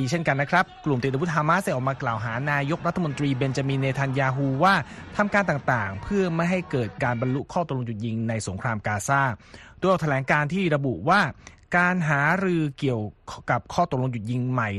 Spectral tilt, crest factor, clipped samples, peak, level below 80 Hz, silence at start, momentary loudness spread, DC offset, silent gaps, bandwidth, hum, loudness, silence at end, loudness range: -6 dB/octave; 18 dB; under 0.1%; -6 dBFS; -52 dBFS; 0 s; 7 LU; under 0.1%; none; 12.5 kHz; none; -24 LUFS; 0 s; 3 LU